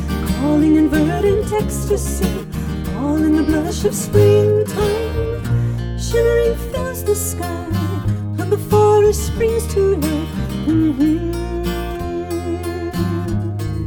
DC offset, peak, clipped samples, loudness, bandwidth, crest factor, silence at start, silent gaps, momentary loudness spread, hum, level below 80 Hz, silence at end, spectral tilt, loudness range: under 0.1%; 0 dBFS; under 0.1%; -18 LUFS; over 20 kHz; 16 dB; 0 s; none; 10 LU; none; -28 dBFS; 0 s; -6.5 dB/octave; 3 LU